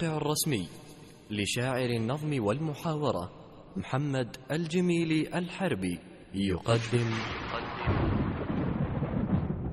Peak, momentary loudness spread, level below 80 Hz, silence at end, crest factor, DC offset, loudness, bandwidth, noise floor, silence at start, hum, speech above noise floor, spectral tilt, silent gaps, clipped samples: -12 dBFS; 11 LU; -46 dBFS; 0 s; 18 dB; under 0.1%; -31 LUFS; 13 kHz; -50 dBFS; 0 s; none; 20 dB; -5.5 dB/octave; none; under 0.1%